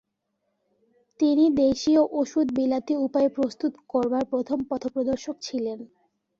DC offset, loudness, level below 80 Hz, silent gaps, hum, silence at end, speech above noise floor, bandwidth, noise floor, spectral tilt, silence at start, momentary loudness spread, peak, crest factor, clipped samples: under 0.1%; -25 LUFS; -60 dBFS; none; none; 0.55 s; 54 dB; 7.6 kHz; -77 dBFS; -5.5 dB/octave; 1.2 s; 10 LU; -10 dBFS; 16 dB; under 0.1%